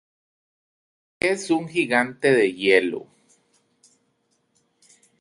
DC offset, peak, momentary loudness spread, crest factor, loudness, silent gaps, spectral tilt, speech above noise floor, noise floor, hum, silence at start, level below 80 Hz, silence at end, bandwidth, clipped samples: under 0.1%; -4 dBFS; 7 LU; 22 dB; -21 LUFS; none; -4.5 dB/octave; 49 dB; -70 dBFS; none; 1.25 s; -66 dBFS; 2.2 s; 11.5 kHz; under 0.1%